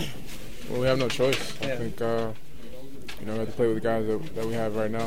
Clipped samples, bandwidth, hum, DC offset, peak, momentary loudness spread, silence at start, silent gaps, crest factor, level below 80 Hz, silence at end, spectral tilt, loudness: under 0.1%; 16 kHz; none; 3%; -8 dBFS; 17 LU; 0 s; none; 20 dB; -48 dBFS; 0 s; -5.5 dB/octave; -28 LUFS